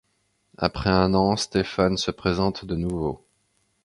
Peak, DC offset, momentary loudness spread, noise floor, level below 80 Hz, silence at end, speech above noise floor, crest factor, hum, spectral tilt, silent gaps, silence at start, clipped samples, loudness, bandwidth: -2 dBFS; under 0.1%; 8 LU; -70 dBFS; -42 dBFS; 0.7 s; 47 dB; 22 dB; none; -5.5 dB/octave; none; 0.6 s; under 0.1%; -24 LUFS; 11 kHz